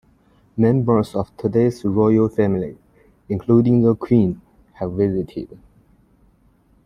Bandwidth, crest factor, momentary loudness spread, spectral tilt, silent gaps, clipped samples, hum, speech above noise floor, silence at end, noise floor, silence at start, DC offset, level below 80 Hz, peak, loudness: 10.5 kHz; 18 dB; 15 LU; -10 dB/octave; none; under 0.1%; none; 39 dB; 1.4 s; -57 dBFS; 0.55 s; under 0.1%; -50 dBFS; -2 dBFS; -19 LUFS